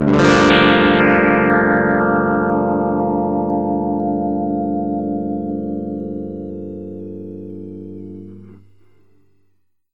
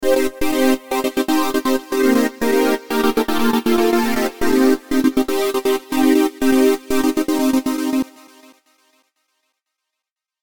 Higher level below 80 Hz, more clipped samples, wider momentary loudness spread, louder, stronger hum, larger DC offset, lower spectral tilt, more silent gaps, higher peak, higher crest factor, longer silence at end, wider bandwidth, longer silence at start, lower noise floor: about the same, -44 dBFS vs -44 dBFS; neither; first, 20 LU vs 4 LU; about the same, -16 LUFS vs -18 LUFS; neither; first, 0.5% vs under 0.1%; first, -6.5 dB/octave vs -3.5 dB/octave; neither; about the same, 0 dBFS vs -2 dBFS; about the same, 18 dB vs 16 dB; second, 1.4 s vs 2.35 s; second, 8.4 kHz vs 19.5 kHz; about the same, 0 s vs 0 s; second, -64 dBFS vs -84 dBFS